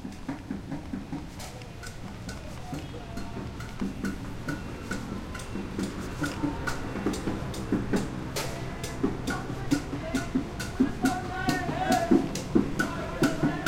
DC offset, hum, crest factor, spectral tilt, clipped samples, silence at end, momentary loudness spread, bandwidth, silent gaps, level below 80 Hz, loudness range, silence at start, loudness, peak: under 0.1%; none; 22 dB; -5.5 dB/octave; under 0.1%; 0 s; 12 LU; 16.5 kHz; none; -42 dBFS; 10 LU; 0 s; -31 LUFS; -8 dBFS